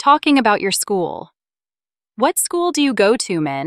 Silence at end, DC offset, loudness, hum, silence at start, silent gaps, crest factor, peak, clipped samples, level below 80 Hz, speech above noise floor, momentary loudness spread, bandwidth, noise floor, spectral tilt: 0 s; under 0.1%; -17 LUFS; none; 0 s; none; 16 dB; -2 dBFS; under 0.1%; -62 dBFS; over 74 dB; 8 LU; 15.5 kHz; under -90 dBFS; -3 dB/octave